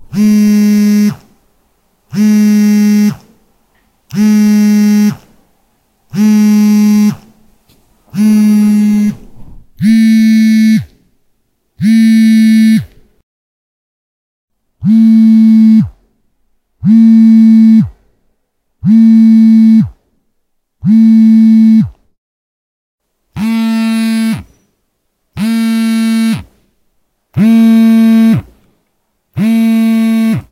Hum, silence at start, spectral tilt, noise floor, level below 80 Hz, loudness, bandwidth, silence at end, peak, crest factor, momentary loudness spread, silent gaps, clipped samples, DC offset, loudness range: none; 0 s; -6.5 dB/octave; -63 dBFS; -46 dBFS; -8 LUFS; 15 kHz; 0.1 s; 0 dBFS; 10 dB; 12 LU; 13.23-14.48 s, 22.18-22.98 s; under 0.1%; under 0.1%; 6 LU